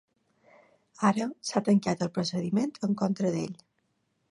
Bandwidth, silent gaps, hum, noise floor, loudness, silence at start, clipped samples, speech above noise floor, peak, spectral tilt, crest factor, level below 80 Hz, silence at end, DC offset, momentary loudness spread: 11 kHz; none; none; -75 dBFS; -29 LUFS; 1 s; under 0.1%; 47 dB; -8 dBFS; -6 dB/octave; 22 dB; -70 dBFS; 0.75 s; under 0.1%; 6 LU